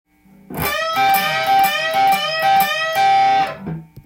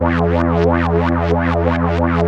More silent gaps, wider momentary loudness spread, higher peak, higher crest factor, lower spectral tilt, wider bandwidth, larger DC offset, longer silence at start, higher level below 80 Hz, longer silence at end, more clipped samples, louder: neither; first, 9 LU vs 2 LU; second, -4 dBFS vs 0 dBFS; about the same, 14 dB vs 14 dB; second, -2.5 dB/octave vs -9 dB/octave; first, 17 kHz vs 6.6 kHz; neither; first, 0.5 s vs 0 s; second, -50 dBFS vs -28 dBFS; about the same, 0.05 s vs 0 s; neither; about the same, -16 LUFS vs -16 LUFS